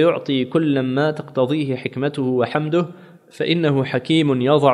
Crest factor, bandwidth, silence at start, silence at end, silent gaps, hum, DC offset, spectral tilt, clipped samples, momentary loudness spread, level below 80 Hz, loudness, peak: 18 dB; 11 kHz; 0 s; 0 s; none; none; under 0.1%; -7.5 dB/octave; under 0.1%; 6 LU; -64 dBFS; -20 LUFS; 0 dBFS